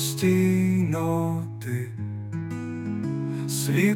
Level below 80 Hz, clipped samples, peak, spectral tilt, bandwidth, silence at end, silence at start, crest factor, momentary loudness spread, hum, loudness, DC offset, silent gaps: -62 dBFS; under 0.1%; -10 dBFS; -6 dB/octave; 18 kHz; 0 s; 0 s; 14 dB; 11 LU; none; -26 LUFS; under 0.1%; none